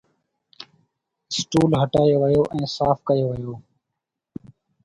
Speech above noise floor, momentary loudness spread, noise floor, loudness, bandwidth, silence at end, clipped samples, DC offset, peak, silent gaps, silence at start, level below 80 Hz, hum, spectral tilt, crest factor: 62 dB; 23 LU; -82 dBFS; -21 LUFS; 11.5 kHz; 1.25 s; under 0.1%; under 0.1%; -4 dBFS; none; 0.6 s; -50 dBFS; none; -6.5 dB/octave; 20 dB